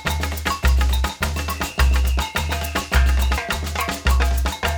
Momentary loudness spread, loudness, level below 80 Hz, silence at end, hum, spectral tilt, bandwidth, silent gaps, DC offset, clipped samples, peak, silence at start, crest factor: 5 LU; -21 LUFS; -20 dBFS; 0 s; none; -4 dB/octave; over 20 kHz; none; under 0.1%; under 0.1%; -4 dBFS; 0 s; 16 dB